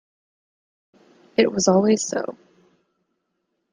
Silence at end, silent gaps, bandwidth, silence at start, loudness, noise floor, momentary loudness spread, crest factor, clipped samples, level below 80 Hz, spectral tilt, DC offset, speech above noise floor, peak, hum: 1.4 s; none; 10 kHz; 1.4 s; -20 LUFS; -75 dBFS; 11 LU; 22 dB; under 0.1%; -66 dBFS; -4.5 dB/octave; under 0.1%; 56 dB; -4 dBFS; none